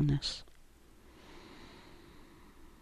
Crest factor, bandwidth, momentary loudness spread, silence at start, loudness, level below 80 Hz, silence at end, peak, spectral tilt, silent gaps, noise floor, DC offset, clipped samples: 18 dB; 12 kHz; 26 LU; 0 s; -37 LUFS; -52 dBFS; 0.15 s; -22 dBFS; -5.5 dB/octave; none; -59 dBFS; under 0.1%; under 0.1%